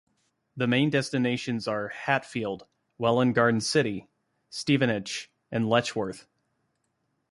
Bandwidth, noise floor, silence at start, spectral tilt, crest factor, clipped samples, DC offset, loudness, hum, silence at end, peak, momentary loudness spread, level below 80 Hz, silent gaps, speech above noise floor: 11.5 kHz; -76 dBFS; 0.55 s; -5 dB/octave; 20 dB; under 0.1%; under 0.1%; -27 LUFS; none; 1.1 s; -8 dBFS; 12 LU; -66 dBFS; none; 50 dB